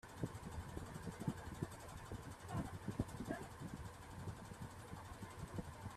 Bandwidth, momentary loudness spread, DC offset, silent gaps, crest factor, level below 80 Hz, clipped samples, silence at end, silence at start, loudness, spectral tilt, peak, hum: 14.5 kHz; 7 LU; under 0.1%; none; 24 dB; -60 dBFS; under 0.1%; 0 s; 0.05 s; -50 LUFS; -6 dB/octave; -26 dBFS; none